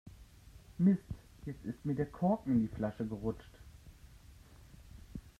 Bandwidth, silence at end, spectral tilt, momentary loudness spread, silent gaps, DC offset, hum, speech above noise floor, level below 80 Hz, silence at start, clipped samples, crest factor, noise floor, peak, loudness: 13 kHz; 0.1 s; -9.5 dB/octave; 26 LU; none; under 0.1%; none; 23 dB; -56 dBFS; 0.05 s; under 0.1%; 20 dB; -57 dBFS; -18 dBFS; -35 LUFS